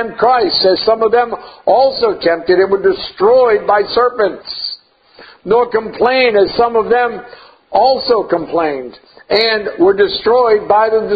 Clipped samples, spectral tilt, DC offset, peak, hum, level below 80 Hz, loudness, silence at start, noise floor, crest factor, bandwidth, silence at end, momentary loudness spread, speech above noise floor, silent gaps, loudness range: under 0.1%; -7 dB/octave; under 0.1%; 0 dBFS; none; -48 dBFS; -13 LUFS; 0 s; -43 dBFS; 12 dB; 5 kHz; 0 s; 9 LU; 30 dB; none; 2 LU